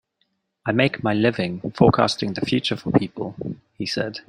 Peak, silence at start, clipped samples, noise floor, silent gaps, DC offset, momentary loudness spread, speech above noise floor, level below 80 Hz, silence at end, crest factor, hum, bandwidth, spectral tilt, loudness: -2 dBFS; 0.65 s; under 0.1%; -71 dBFS; none; under 0.1%; 13 LU; 50 dB; -52 dBFS; 0.1 s; 20 dB; none; 11 kHz; -6 dB/octave; -22 LUFS